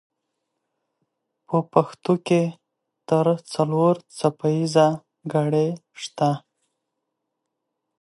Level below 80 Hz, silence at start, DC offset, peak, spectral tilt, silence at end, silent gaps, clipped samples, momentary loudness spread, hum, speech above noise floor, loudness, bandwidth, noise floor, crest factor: -72 dBFS; 1.5 s; under 0.1%; -2 dBFS; -7 dB/octave; 1.65 s; none; under 0.1%; 8 LU; none; 59 dB; -22 LUFS; 11.5 kHz; -80 dBFS; 22 dB